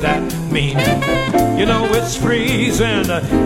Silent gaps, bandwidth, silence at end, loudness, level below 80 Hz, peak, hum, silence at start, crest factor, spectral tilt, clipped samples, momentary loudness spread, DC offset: none; 17 kHz; 0 s; -16 LUFS; -30 dBFS; -2 dBFS; none; 0 s; 14 dB; -5 dB/octave; under 0.1%; 3 LU; under 0.1%